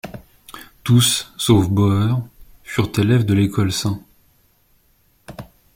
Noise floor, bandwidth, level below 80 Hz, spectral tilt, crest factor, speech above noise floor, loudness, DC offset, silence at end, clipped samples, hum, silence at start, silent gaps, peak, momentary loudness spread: -59 dBFS; 16.5 kHz; -46 dBFS; -5 dB/octave; 18 dB; 42 dB; -18 LUFS; under 0.1%; 0.3 s; under 0.1%; none; 0.05 s; none; -2 dBFS; 24 LU